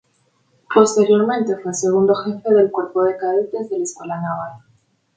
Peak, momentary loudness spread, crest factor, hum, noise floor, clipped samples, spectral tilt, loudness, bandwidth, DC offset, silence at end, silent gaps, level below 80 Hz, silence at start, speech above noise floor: 0 dBFS; 11 LU; 18 dB; none; -62 dBFS; under 0.1%; -5.5 dB/octave; -18 LUFS; 9.4 kHz; under 0.1%; 0.6 s; none; -64 dBFS; 0.7 s; 45 dB